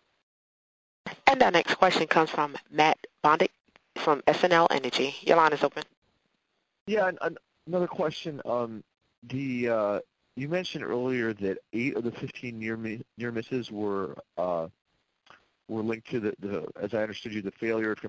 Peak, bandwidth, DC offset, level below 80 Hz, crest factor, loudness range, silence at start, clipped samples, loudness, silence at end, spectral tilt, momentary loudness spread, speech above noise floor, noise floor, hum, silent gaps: -4 dBFS; 8 kHz; under 0.1%; -66 dBFS; 24 dB; 9 LU; 1.05 s; under 0.1%; -28 LUFS; 0 s; -5 dB/octave; 15 LU; 49 dB; -77 dBFS; none; 5.97-6.02 s, 6.81-6.86 s, 9.18-9.22 s